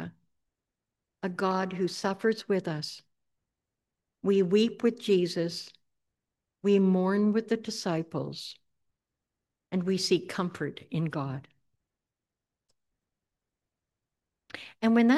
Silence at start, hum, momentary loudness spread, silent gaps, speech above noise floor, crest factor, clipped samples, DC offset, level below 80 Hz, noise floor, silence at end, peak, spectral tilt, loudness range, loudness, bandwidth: 0 s; none; 15 LU; none; 62 dB; 20 dB; under 0.1%; under 0.1%; -78 dBFS; -89 dBFS; 0 s; -12 dBFS; -6 dB/octave; 9 LU; -29 LUFS; 12.5 kHz